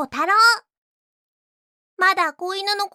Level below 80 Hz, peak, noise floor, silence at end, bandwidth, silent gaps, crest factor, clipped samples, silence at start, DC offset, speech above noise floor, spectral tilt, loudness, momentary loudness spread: -70 dBFS; -4 dBFS; under -90 dBFS; 0.05 s; 16 kHz; 0.77-1.97 s; 16 dB; under 0.1%; 0 s; under 0.1%; over 71 dB; 0 dB/octave; -18 LUFS; 9 LU